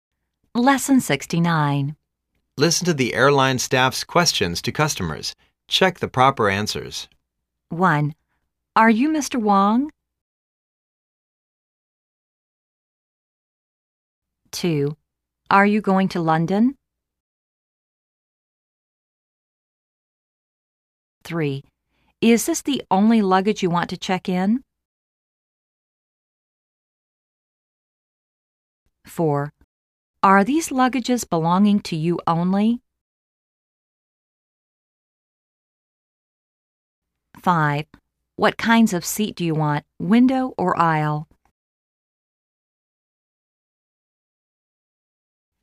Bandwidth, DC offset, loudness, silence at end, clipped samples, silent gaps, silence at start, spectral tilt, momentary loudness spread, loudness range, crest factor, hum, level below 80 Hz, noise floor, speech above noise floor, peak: 15.5 kHz; under 0.1%; -20 LUFS; 4.4 s; under 0.1%; 10.21-14.22 s, 17.20-21.21 s, 24.85-28.86 s, 29.64-30.14 s, 33.01-37.02 s; 0.55 s; -5 dB/octave; 11 LU; 11 LU; 20 dB; none; -58 dBFS; -78 dBFS; 59 dB; -2 dBFS